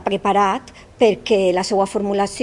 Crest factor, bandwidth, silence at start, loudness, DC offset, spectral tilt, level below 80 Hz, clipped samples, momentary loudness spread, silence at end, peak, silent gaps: 16 dB; 11.5 kHz; 0 s; -18 LUFS; under 0.1%; -4.5 dB/octave; -50 dBFS; under 0.1%; 3 LU; 0 s; -2 dBFS; none